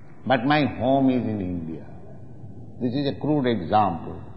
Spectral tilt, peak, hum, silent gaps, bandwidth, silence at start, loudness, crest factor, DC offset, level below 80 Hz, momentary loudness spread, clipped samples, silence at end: -9.5 dB/octave; -6 dBFS; none; none; 5.6 kHz; 0.1 s; -23 LUFS; 18 dB; 0.9%; -52 dBFS; 22 LU; under 0.1%; 0 s